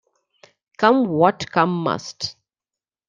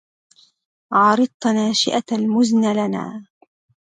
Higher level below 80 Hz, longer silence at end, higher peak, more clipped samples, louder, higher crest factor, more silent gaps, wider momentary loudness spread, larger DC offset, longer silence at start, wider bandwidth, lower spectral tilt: first, -62 dBFS vs -68 dBFS; about the same, 0.8 s vs 0.7 s; about the same, -2 dBFS vs -4 dBFS; neither; about the same, -20 LUFS vs -18 LUFS; about the same, 20 dB vs 16 dB; second, none vs 1.34-1.40 s; first, 13 LU vs 10 LU; neither; about the same, 0.8 s vs 0.9 s; about the same, 9.2 kHz vs 9.6 kHz; about the same, -5.5 dB/octave vs -4.5 dB/octave